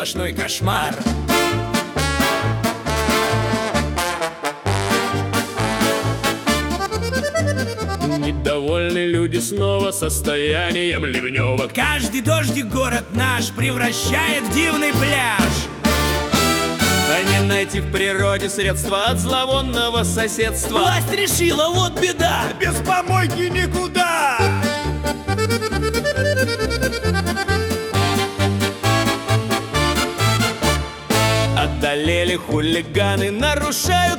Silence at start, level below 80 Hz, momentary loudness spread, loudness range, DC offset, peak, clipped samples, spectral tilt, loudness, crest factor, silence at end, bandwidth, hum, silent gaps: 0 s; -34 dBFS; 5 LU; 3 LU; under 0.1%; -4 dBFS; under 0.1%; -4 dB/octave; -19 LUFS; 16 dB; 0 s; 18 kHz; none; none